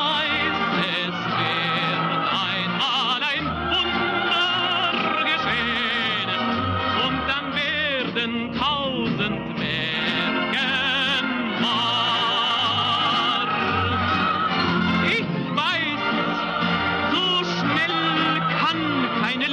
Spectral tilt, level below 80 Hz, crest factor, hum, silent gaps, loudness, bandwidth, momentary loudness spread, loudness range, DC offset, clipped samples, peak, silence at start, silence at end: -5 dB/octave; -50 dBFS; 12 dB; none; none; -21 LUFS; 10.5 kHz; 4 LU; 2 LU; under 0.1%; under 0.1%; -10 dBFS; 0 s; 0 s